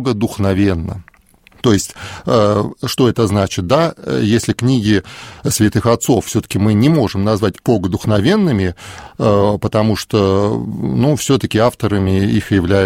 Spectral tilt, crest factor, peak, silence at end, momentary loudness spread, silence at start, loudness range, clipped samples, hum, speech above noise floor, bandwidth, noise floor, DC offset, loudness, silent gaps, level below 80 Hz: -6 dB/octave; 14 dB; 0 dBFS; 0 s; 6 LU; 0 s; 1 LU; under 0.1%; none; 34 dB; 16.5 kHz; -48 dBFS; under 0.1%; -15 LUFS; none; -40 dBFS